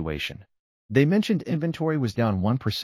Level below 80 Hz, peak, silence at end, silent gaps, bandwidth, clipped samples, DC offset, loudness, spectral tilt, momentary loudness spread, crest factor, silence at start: -50 dBFS; -8 dBFS; 0 s; 0.59-0.89 s; 14.5 kHz; under 0.1%; under 0.1%; -25 LUFS; -7 dB/octave; 9 LU; 16 dB; 0 s